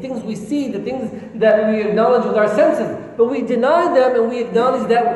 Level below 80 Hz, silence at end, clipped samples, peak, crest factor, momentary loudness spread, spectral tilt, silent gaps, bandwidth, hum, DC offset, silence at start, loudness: -58 dBFS; 0 s; under 0.1%; -2 dBFS; 14 dB; 11 LU; -6.5 dB/octave; none; 11.5 kHz; none; under 0.1%; 0 s; -17 LUFS